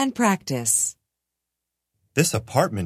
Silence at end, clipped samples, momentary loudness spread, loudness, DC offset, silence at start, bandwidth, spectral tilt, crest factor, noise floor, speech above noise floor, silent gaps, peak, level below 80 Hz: 0 s; under 0.1%; 5 LU; -22 LUFS; under 0.1%; 0 s; 16 kHz; -4 dB/octave; 20 dB; -83 dBFS; 61 dB; none; -4 dBFS; -52 dBFS